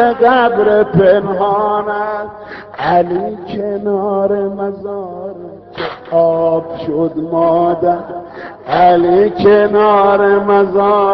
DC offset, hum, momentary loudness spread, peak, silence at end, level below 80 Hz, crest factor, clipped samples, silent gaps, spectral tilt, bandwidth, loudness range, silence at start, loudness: under 0.1%; none; 16 LU; 0 dBFS; 0 s; -48 dBFS; 12 dB; under 0.1%; none; -5 dB/octave; 5.6 kHz; 6 LU; 0 s; -12 LUFS